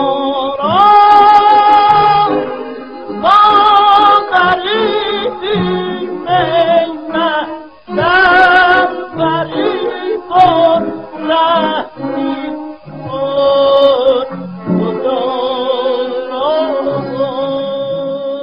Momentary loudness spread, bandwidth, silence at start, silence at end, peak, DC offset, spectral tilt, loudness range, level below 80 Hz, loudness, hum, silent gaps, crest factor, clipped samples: 14 LU; 6.8 kHz; 0 s; 0 s; 0 dBFS; 0.5%; -6.5 dB/octave; 6 LU; -48 dBFS; -11 LUFS; none; none; 12 dB; under 0.1%